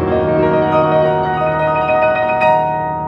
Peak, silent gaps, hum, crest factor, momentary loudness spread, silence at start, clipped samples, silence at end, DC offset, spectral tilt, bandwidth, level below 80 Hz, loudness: -2 dBFS; none; none; 12 dB; 3 LU; 0 s; under 0.1%; 0 s; under 0.1%; -8.5 dB/octave; 5.6 kHz; -40 dBFS; -14 LUFS